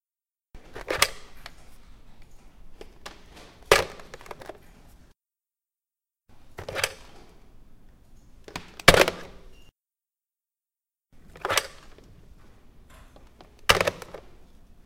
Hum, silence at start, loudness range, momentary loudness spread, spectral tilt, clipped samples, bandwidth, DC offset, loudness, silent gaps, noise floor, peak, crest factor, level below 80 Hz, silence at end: none; 0.55 s; 12 LU; 28 LU; -2.5 dB/octave; under 0.1%; 16.5 kHz; under 0.1%; -23 LUFS; none; under -90 dBFS; 0 dBFS; 30 dB; -46 dBFS; 0.65 s